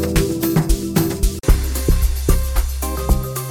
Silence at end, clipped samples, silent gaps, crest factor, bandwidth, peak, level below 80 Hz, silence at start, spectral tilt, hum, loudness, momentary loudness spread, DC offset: 0 s; under 0.1%; none; 16 dB; 17.5 kHz; 0 dBFS; -18 dBFS; 0 s; -5.5 dB/octave; none; -19 LUFS; 4 LU; under 0.1%